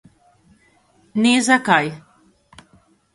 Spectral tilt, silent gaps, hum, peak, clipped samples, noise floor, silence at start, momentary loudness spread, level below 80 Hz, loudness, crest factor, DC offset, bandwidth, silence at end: -3.5 dB/octave; none; none; 0 dBFS; under 0.1%; -57 dBFS; 1.15 s; 14 LU; -62 dBFS; -17 LUFS; 22 dB; under 0.1%; 11.5 kHz; 1.15 s